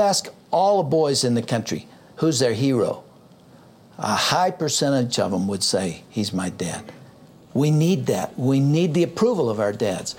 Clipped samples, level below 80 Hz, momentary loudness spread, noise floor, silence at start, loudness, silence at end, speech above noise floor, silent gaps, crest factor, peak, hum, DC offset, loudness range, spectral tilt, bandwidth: under 0.1%; -62 dBFS; 9 LU; -49 dBFS; 0 s; -22 LUFS; 0 s; 28 dB; none; 16 dB; -6 dBFS; none; under 0.1%; 2 LU; -5 dB/octave; 17 kHz